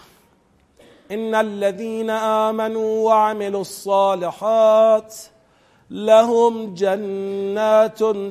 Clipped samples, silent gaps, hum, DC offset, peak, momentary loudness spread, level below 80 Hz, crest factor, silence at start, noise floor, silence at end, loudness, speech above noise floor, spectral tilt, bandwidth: under 0.1%; none; none; under 0.1%; -2 dBFS; 12 LU; -68 dBFS; 18 dB; 1.1 s; -58 dBFS; 0 s; -18 LUFS; 40 dB; -5 dB/octave; 14.5 kHz